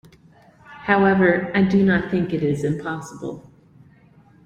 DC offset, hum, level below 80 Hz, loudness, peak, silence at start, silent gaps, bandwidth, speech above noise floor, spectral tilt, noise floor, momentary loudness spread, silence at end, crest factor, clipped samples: under 0.1%; none; -52 dBFS; -19 LUFS; -4 dBFS; 0.7 s; none; 8.6 kHz; 32 dB; -7.5 dB/octave; -52 dBFS; 17 LU; 1.05 s; 18 dB; under 0.1%